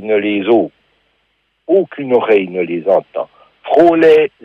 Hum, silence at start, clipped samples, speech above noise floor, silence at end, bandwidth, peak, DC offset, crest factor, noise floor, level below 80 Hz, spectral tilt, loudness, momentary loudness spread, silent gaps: none; 0 s; under 0.1%; 51 dB; 0.15 s; 6.2 kHz; 0 dBFS; under 0.1%; 12 dB; -63 dBFS; -60 dBFS; -7.5 dB/octave; -13 LUFS; 16 LU; none